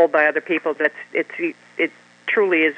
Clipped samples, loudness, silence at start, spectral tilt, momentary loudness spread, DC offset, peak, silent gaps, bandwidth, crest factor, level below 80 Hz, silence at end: under 0.1%; -21 LUFS; 0 s; -5.5 dB/octave; 10 LU; under 0.1%; -2 dBFS; none; 8.8 kHz; 18 dB; -82 dBFS; 0 s